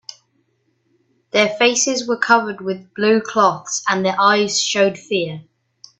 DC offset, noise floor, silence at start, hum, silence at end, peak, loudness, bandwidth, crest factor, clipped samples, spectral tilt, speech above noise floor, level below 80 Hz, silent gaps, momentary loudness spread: under 0.1%; -65 dBFS; 1.35 s; none; 0.55 s; 0 dBFS; -17 LUFS; 8.4 kHz; 18 dB; under 0.1%; -2.5 dB/octave; 48 dB; -66 dBFS; none; 11 LU